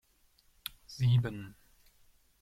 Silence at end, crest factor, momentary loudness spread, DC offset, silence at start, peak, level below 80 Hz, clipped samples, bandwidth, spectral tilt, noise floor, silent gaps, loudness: 0.9 s; 20 dB; 18 LU; under 0.1%; 0.9 s; -16 dBFS; -62 dBFS; under 0.1%; 14 kHz; -6.5 dB/octave; -68 dBFS; none; -33 LUFS